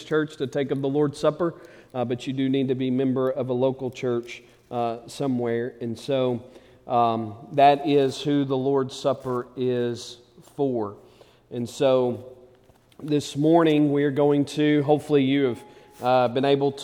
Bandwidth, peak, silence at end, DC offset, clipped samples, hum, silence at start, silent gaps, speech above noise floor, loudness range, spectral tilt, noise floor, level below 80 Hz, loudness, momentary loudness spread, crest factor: 13.5 kHz; -6 dBFS; 0 s; under 0.1%; under 0.1%; none; 0 s; none; 33 dB; 6 LU; -6.5 dB/octave; -56 dBFS; -66 dBFS; -24 LUFS; 13 LU; 18 dB